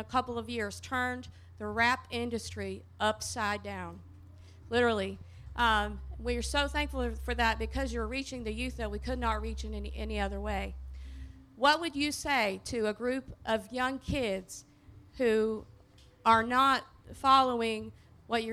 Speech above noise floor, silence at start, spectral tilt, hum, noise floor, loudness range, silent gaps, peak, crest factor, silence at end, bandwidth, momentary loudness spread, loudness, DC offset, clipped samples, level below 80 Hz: 27 dB; 0 s; -4 dB/octave; none; -58 dBFS; 5 LU; none; -10 dBFS; 22 dB; 0 s; 15.5 kHz; 16 LU; -31 LUFS; under 0.1%; under 0.1%; -44 dBFS